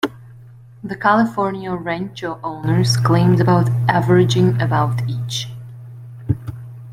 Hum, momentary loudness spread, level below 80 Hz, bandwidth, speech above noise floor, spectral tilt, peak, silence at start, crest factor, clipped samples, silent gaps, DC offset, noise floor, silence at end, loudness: none; 20 LU; -48 dBFS; 13.5 kHz; 25 dB; -6.5 dB/octave; -2 dBFS; 0.05 s; 16 dB; under 0.1%; none; under 0.1%; -41 dBFS; 0 s; -18 LUFS